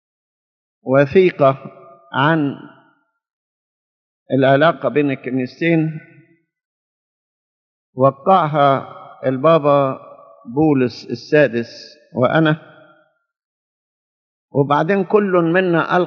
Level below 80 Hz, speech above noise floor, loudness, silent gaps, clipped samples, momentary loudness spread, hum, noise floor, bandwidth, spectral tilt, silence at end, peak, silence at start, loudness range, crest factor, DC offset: -64 dBFS; 44 dB; -16 LUFS; 3.33-4.26 s, 6.65-7.93 s, 13.45-14.48 s; under 0.1%; 15 LU; none; -59 dBFS; 6.6 kHz; -5.5 dB/octave; 0 s; 0 dBFS; 0.85 s; 4 LU; 18 dB; under 0.1%